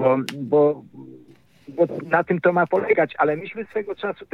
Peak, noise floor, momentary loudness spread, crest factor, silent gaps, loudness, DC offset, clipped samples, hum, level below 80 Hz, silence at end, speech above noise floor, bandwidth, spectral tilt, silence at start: -4 dBFS; -52 dBFS; 10 LU; 18 dB; none; -21 LUFS; under 0.1%; under 0.1%; none; -68 dBFS; 0.1 s; 31 dB; 13 kHz; -7 dB/octave; 0 s